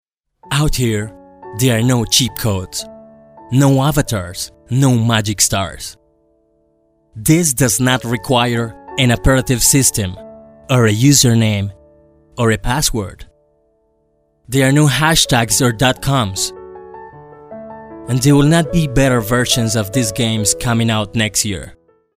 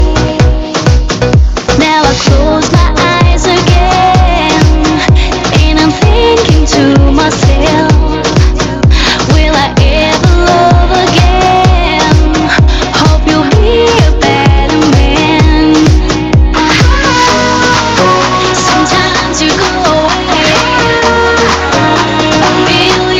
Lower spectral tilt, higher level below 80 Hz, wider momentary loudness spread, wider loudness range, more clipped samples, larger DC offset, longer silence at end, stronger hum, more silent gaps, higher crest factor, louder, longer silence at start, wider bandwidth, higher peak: about the same, -4 dB/octave vs -5 dB/octave; second, -34 dBFS vs -12 dBFS; first, 16 LU vs 3 LU; first, 4 LU vs 1 LU; second, under 0.1% vs 2%; neither; first, 0.45 s vs 0 s; neither; neither; first, 16 dB vs 6 dB; second, -14 LUFS vs -7 LUFS; first, 0.45 s vs 0 s; first, 16 kHz vs 9 kHz; about the same, 0 dBFS vs 0 dBFS